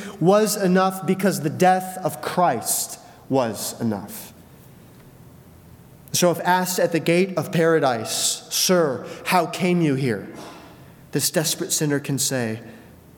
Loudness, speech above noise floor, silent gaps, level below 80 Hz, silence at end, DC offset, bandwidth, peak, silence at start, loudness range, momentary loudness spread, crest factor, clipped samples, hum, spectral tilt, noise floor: -21 LUFS; 25 dB; none; -64 dBFS; 0.35 s; under 0.1%; 19 kHz; -2 dBFS; 0 s; 6 LU; 11 LU; 20 dB; under 0.1%; none; -4 dB/octave; -46 dBFS